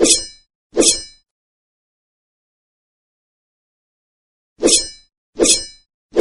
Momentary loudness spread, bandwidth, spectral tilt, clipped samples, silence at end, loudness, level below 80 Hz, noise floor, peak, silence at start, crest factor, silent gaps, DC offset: 16 LU; 11.5 kHz; -0.5 dB/octave; under 0.1%; 0 s; -15 LUFS; -44 dBFS; under -90 dBFS; 0 dBFS; 0 s; 20 dB; 0.55-0.70 s, 1.31-4.56 s, 5.17-5.33 s, 5.94-6.09 s; under 0.1%